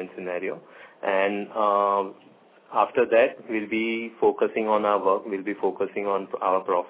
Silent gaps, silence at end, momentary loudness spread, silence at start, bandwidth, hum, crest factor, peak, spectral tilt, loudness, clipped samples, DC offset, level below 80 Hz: none; 0 s; 9 LU; 0 s; 4 kHz; none; 18 dB; -8 dBFS; -9 dB/octave; -25 LUFS; under 0.1%; under 0.1%; -72 dBFS